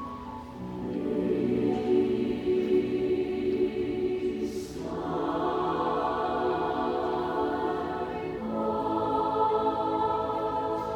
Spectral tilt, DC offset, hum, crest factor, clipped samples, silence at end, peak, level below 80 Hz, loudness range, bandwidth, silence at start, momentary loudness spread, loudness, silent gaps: -7 dB/octave; under 0.1%; none; 14 dB; under 0.1%; 0 s; -14 dBFS; -54 dBFS; 2 LU; 10.5 kHz; 0 s; 8 LU; -29 LUFS; none